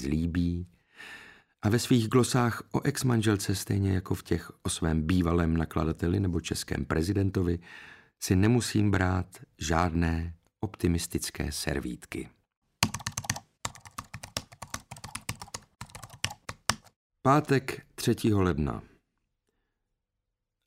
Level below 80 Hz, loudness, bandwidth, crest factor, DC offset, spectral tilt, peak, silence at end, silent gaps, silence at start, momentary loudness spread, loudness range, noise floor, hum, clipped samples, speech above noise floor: -46 dBFS; -29 LUFS; 16 kHz; 30 dB; under 0.1%; -5.5 dB/octave; 0 dBFS; 1.8 s; 12.57-12.62 s, 16.96-17.10 s; 0 s; 17 LU; 8 LU; -84 dBFS; none; under 0.1%; 57 dB